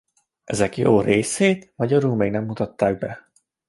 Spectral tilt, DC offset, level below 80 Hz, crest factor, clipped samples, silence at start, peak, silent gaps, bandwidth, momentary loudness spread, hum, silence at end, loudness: -5.5 dB/octave; under 0.1%; -52 dBFS; 18 dB; under 0.1%; 0.5 s; -2 dBFS; none; 11.5 kHz; 11 LU; none; 0.5 s; -21 LUFS